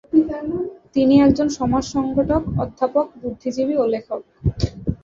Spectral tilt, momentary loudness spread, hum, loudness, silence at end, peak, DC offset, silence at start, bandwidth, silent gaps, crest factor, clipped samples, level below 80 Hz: -7.5 dB/octave; 12 LU; none; -20 LUFS; 0.05 s; -2 dBFS; under 0.1%; 0.15 s; 7.6 kHz; none; 18 dB; under 0.1%; -36 dBFS